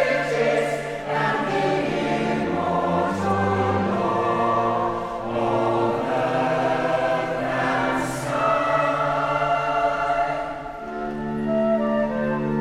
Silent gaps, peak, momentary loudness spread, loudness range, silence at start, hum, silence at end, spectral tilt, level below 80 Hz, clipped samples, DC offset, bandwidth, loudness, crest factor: none; -8 dBFS; 5 LU; 1 LU; 0 s; none; 0 s; -6 dB/octave; -48 dBFS; under 0.1%; under 0.1%; 14.5 kHz; -23 LUFS; 14 dB